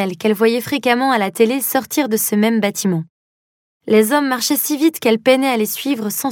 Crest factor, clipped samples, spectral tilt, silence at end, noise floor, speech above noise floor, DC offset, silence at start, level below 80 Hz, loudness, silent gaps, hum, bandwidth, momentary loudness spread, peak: 16 dB; under 0.1%; -4 dB/octave; 0 s; under -90 dBFS; over 74 dB; under 0.1%; 0 s; -68 dBFS; -16 LUFS; 3.09-3.80 s; none; 17.5 kHz; 6 LU; 0 dBFS